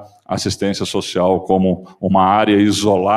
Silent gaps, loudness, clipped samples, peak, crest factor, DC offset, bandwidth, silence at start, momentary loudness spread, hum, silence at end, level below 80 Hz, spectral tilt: none; -16 LUFS; under 0.1%; 0 dBFS; 16 dB; under 0.1%; 14 kHz; 0 s; 9 LU; none; 0 s; -52 dBFS; -5.5 dB/octave